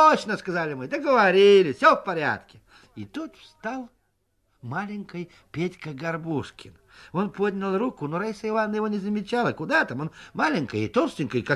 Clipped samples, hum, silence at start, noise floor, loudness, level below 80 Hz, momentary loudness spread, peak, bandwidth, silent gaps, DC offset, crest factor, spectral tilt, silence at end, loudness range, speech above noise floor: under 0.1%; none; 0 s; -72 dBFS; -24 LUFS; -62 dBFS; 18 LU; -4 dBFS; 11.5 kHz; none; under 0.1%; 20 dB; -6 dB/octave; 0 s; 12 LU; 47 dB